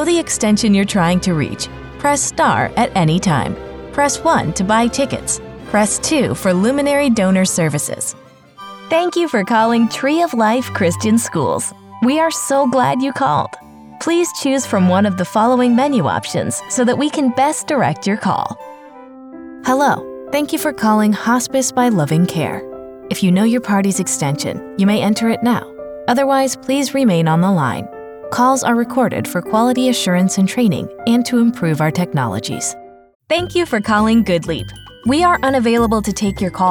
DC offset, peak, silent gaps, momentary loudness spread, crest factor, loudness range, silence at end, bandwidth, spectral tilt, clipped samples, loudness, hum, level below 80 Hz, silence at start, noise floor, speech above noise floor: under 0.1%; -2 dBFS; 33.15-33.20 s; 9 LU; 12 dB; 2 LU; 0 s; 20 kHz; -5 dB/octave; under 0.1%; -16 LUFS; none; -44 dBFS; 0 s; -37 dBFS; 22 dB